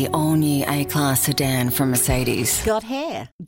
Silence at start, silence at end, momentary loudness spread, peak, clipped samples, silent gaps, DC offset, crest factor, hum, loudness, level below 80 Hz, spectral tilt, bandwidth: 0 s; 0 s; 5 LU; -6 dBFS; under 0.1%; 3.32-3.39 s; under 0.1%; 14 dB; none; -20 LUFS; -38 dBFS; -4.5 dB/octave; 17 kHz